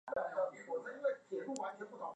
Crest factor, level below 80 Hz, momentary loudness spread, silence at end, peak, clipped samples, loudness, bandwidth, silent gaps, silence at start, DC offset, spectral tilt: 18 dB; -84 dBFS; 5 LU; 0 s; -24 dBFS; under 0.1%; -41 LUFS; 10 kHz; none; 0.05 s; under 0.1%; -4.5 dB/octave